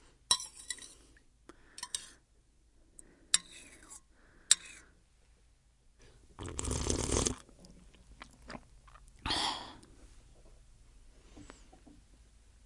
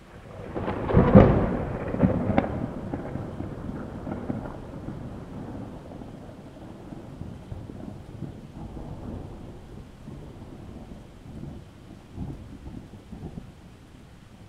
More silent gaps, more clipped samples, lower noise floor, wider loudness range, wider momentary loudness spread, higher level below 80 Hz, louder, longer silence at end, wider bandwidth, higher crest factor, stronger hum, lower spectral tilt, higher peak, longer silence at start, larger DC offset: neither; neither; first, -67 dBFS vs -48 dBFS; second, 6 LU vs 19 LU; first, 26 LU vs 20 LU; second, -52 dBFS vs -40 dBFS; second, -34 LUFS vs -26 LUFS; first, 0.45 s vs 0 s; first, 11.5 kHz vs 10 kHz; first, 36 dB vs 28 dB; neither; second, -2 dB/octave vs -9.5 dB/octave; second, -4 dBFS vs 0 dBFS; first, 0.3 s vs 0 s; neither